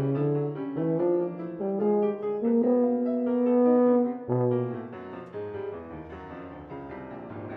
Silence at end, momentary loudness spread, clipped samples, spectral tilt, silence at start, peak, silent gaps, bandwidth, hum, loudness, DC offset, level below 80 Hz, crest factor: 0 s; 18 LU; under 0.1%; -12 dB/octave; 0 s; -10 dBFS; none; 3.8 kHz; none; -26 LUFS; under 0.1%; -62 dBFS; 16 dB